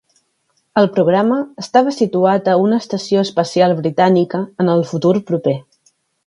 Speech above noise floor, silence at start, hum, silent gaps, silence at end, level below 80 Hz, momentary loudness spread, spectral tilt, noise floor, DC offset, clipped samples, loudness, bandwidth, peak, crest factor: 50 dB; 0.75 s; none; none; 0.65 s; -62 dBFS; 6 LU; -6.5 dB/octave; -65 dBFS; under 0.1%; under 0.1%; -15 LUFS; 11 kHz; 0 dBFS; 16 dB